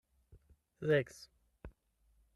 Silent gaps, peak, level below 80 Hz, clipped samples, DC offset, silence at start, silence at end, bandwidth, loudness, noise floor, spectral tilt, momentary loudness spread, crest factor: none; -20 dBFS; -64 dBFS; under 0.1%; under 0.1%; 0.8 s; 0.65 s; 12.5 kHz; -35 LUFS; -73 dBFS; -6.5 dB/octave; 25 LU; 20 dB